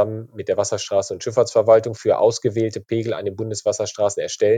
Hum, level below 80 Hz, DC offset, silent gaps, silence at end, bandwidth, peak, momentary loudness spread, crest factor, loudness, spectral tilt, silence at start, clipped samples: none; -66 dBFS; under 0.1%; none; 0 s; 9.4 kHz; -2 dBFS; 9 LU; 18 dB; -20 LUFS; -5 dB/octave; 0 s; under 0.1%